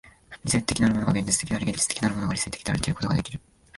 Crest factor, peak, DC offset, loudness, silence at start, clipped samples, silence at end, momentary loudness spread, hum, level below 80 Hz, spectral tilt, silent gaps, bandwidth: 22 dB; -4 dBFS; under 0.1%; -25 LUFS; 0.05 s; under 0.1%; 0.4 s; 6 LU; none; -44 dBFS; -4 dB/octave; none; 11.5 kHz